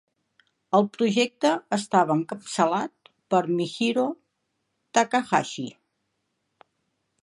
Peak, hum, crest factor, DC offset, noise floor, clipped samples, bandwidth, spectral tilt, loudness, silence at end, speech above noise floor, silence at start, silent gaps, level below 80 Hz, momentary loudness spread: -4 dBFS; none; 22 dB; under 0.1%; -77 dBFS; under 0.1%; 11.5 kHz; -4.5 dB/octave; -24 LUFS; 1.5 s; 53 dB; 0.7 s; none; -76 dBFS; 10 LU